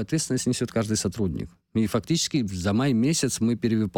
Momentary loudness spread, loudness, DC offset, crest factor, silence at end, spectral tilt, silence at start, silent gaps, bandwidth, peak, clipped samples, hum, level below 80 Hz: 6 LU; -25 LUFS; under 0.1%; 14 dB; 0 s; -5 dB/octave; 0 s; none; 18 kHz; -12 dBFS; under 0.1%; none; -50 dBFS